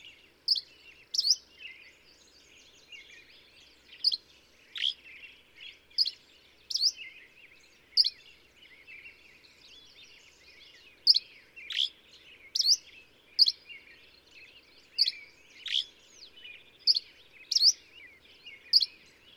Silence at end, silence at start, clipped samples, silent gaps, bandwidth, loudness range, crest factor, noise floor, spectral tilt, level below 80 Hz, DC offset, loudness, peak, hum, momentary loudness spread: 0.5 s; 0.05 s; under 0.1%; none; 19.5 kHz; 8 LU; 26 dB; -60 dBFS; 3.5 dB/octave; -76 dBFS; under 0.1%; -27 LUFS; -8 dBFS; none; 25 LU